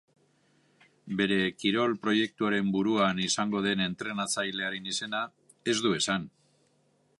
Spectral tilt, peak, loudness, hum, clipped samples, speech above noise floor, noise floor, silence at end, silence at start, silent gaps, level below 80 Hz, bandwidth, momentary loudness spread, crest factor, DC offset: -3.5 dB/octave; -12 dBFS; -29 LUFS; none; under 0.1%; 40 dB; -69 dBFS; 0.9 s; 1.05 s; none; -68 dBFS; 11.5 kHz; 7 LU; 18 dB; under 0.1%